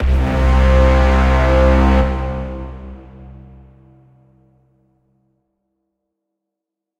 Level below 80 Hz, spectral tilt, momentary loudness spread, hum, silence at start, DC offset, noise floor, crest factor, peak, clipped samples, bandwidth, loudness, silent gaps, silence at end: -18 dBFS; -7.5 dB/octave; 20 LU; none; 0 s; under 0.1%; -82 dBFS; 14 dB; -2 dBFS; under 0.1%; 7.4 kHz; -14 LUFS; none; 3.7 s